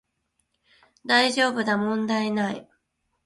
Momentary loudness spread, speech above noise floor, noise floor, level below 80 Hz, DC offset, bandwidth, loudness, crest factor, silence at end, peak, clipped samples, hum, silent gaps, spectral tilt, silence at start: 12 LU; 51 dB; -75 dBFS; -68 dBFS; under 0.1%; 11.5 kHz; -23 LUFS; 20 dB; 0.6 s; -6 dBFS; under 0.1%; none; none; -4 dB/octave; 1.05 s